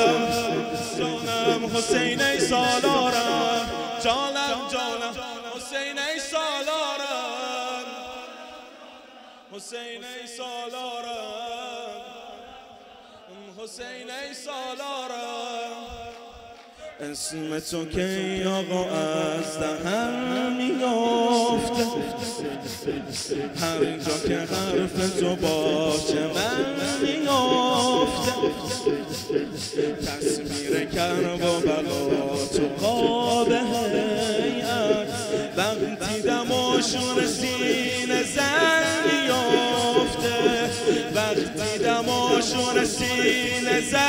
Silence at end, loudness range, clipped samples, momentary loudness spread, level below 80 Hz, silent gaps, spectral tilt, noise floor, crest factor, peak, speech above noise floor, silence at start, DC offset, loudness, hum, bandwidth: 0 s; 13 LU; under 0.1%; 14 LU; -52 dBFS; none; -3.5 dB/octave; -47 dBFS; 20 dB; -4 dBFS; 22 dB; 0 s; under 0.1%; -24 LUFS; none; 16 kHz